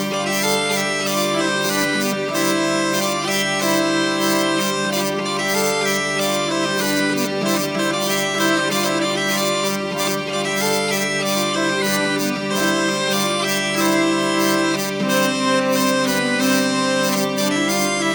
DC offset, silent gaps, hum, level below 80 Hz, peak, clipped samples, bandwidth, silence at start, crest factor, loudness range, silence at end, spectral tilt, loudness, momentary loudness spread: under 0.1%; none; none; -58 dBFS; -4 dBFS; under 0.1%; over 20 kHz; 0 s; 14 dB; 1 LU; 0 s; -3 dB/octave; -18 LUFS; 3 LU